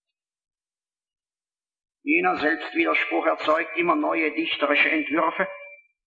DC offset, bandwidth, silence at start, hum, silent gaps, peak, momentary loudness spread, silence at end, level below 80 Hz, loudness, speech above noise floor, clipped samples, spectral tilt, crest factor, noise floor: under 0.1%; 7.4 kHz; 2.05 s; none; none; -8 dBFS; 6 LU; 0.3 s; -70 dBFS; -22 LUFS; over 67 dB; under 0.1%; -5.5 dB/octave; 18 dB; under -90 dBFS